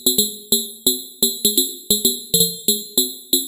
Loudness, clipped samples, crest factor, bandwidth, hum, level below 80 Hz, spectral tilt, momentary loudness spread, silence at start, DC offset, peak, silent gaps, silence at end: -17 LUFS; under 0.1%; 18 dB; 17 kHz; none; -56 dBFS; -2 dB/octave; 3 LU; 0 s; under 0.1%; -2 dBFS; none; 0 s